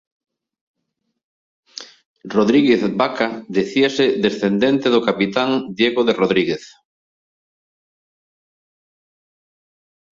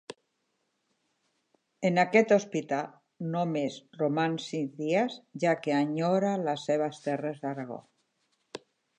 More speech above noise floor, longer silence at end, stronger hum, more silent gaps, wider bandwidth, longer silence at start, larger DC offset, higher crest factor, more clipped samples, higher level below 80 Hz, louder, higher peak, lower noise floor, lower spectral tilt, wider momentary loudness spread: first, 58 dB vs 49 dB; first, 3.45 s vs 0.4 s; neither; first, 2.06-2.16 s vs none; second, 7.6 kHz vs 10 kHz; first, 1.75 s vs 0.1 s; neither; about the same, 18 dB vs 20 dB; neither; first, -60 dBFS vs -84 dBFS; first, -17 LUFS vs -29 LUFS; first, -2 dBFS vs -10 dBFS; about the same, -75 dBFS vs -78 dBFS; about the same, -5.5 dB/octave vs -6 dB/octave; second, 9 LU vs 18 LU